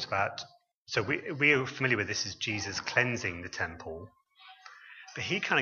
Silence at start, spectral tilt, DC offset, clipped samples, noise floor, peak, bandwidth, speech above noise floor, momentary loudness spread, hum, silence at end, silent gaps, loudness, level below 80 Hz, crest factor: 0 s; -3.5 dB/octave; under 0.1%; under 0.1%; -54 dBFS; -10 dBFS; 7.4 kHz; 23 dB; 21 LU; none; 0 s; 0.74-0.86 s; -30 LUFS; -64 dBFS; 24 dB